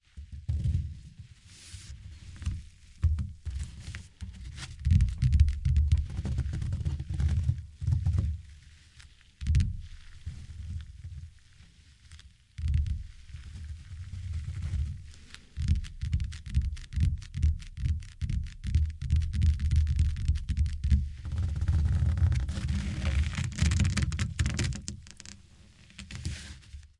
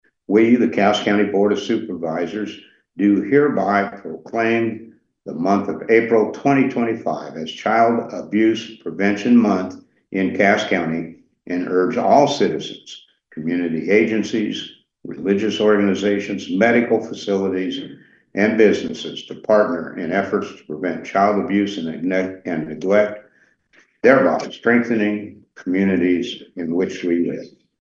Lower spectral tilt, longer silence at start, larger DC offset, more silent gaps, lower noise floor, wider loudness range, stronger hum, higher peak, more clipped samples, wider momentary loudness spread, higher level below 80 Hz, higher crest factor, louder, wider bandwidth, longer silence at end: about the same, -6 dB/octave vs -6 dB/octave; second, 0.15 s vs 0.3 s; neither; neither; about the same, -56 dBFS vs -57 dBFS; first, 9 LU vs 2 LU; neither; second, -10 dBFS vs 0 dBFS; neither; first, 20 LU vs 15 LU; first, -34 dBFS vs -64 dBFS; about the same, 20 dB vs 18 dB; second, -31 LUFS vs -19 LUFS; first, 11 kHz vs 7.6 kHz; second, 0.15 s vs 0.3 s